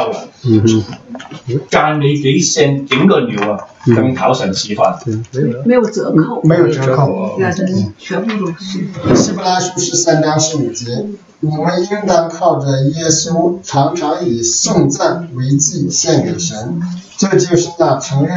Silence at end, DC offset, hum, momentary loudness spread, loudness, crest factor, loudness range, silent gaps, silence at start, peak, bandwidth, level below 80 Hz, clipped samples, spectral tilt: 0 s; under 0.1%; none; 9 LU; -13 LUFS; 14 dB; 2 LU; none; 0 s; 0 dBFS; 8 kHz; -50 dBFS; under 0.1%; -5 dB/octave